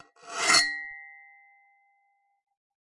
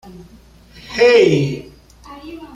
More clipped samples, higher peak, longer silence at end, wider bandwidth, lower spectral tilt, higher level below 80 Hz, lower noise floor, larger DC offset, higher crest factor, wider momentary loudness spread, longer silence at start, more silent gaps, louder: neither; second, -8 dBFS vs -2 dBFS; first, 1.8 s vs 0.1 s; first, 11.5 kHz vs 9.6 kHz; second, 1 dB/octave vs -6 dB/octave; second, -76 dBFS vs -48 dBFS; first, -71 dBFS vs -40 dBFS; neither; first, 24 dB vs 16 dB; second, 20 LU vs 24 LU; first, 0.25 s vs 0.05 s; neither; second, -23 LUFS vs -14 LUFS